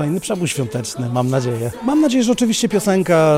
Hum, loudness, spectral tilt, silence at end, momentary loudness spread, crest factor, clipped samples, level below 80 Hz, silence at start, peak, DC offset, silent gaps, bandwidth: none; -18 LUFS; -5.5 dB/octave; 0 s; 7 LU; 12 dB; under 0.1%; -52 dBFS; 0 s; -4 dBFS; under 0.1%; none; 16 kHz